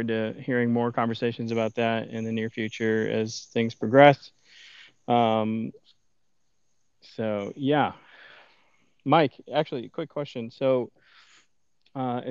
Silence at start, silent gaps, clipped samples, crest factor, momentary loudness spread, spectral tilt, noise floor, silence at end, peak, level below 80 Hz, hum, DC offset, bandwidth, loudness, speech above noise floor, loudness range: 0 s; none; under 0.1%; 24 dB; 11 LU; -6.5 dB/octave; -78 dBFS; 0 s; -2 dBFS; -78 dBFS; none; under 0.1%; 7.4 kHz; -26 LUFS; 53 dB; 7 LU